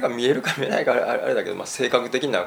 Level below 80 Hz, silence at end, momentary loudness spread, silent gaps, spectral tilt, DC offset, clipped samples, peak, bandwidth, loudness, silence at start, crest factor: -70 dBFS; 0 s; 4 LU; none; -4 dB/octave; under 0.1%; under 0.1%; -2 dBFS; over 20 kHz; -22 LUFS; 0 s; 20 dB